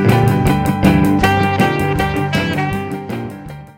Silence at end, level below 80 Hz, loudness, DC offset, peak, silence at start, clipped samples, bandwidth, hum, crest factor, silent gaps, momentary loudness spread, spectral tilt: 0.05 s; -30 dBFS; -15 LUFS; under 0.1%; 0 dBFS; 0 s; under 0.1%; 17 kHz; none; 14 dB; none; 12 LU; -6.5 dB/octave